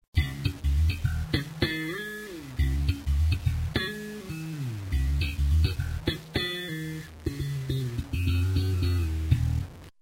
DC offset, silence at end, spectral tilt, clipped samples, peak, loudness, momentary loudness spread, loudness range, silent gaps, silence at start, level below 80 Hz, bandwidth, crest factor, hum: under 0.1%; 0.1 s; -6 dB/octave; under 0.1%; -10 dBFS; -29 LUFS; 9 LU; 1 LU; none; 0.15 s; -32 dBFS; 16 kHz; 18 dB; none